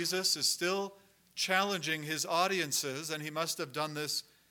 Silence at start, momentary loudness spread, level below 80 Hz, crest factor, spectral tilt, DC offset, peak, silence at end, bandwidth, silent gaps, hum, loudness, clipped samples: 0 s; 8 LU; -84 dBFS; 20 dB; -2 dB/octave; under 0.1%; -14 dBFS; 0.3 s; 19 kHz; none; none; -32 LUFS; under 0.1%